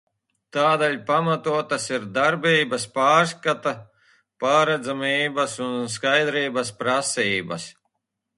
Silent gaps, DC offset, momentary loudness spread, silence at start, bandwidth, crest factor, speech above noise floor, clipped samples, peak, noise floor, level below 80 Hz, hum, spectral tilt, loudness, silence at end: none; under 0.1%; 9 LU; 0.55 s; 11.5 kHz; 18 dB; 57 dB; under 0.1%; -6 dBFS; -80 dBFS; -68 dBFS; none; -3.5 dB/octave; -22 LUFS; 0.65 s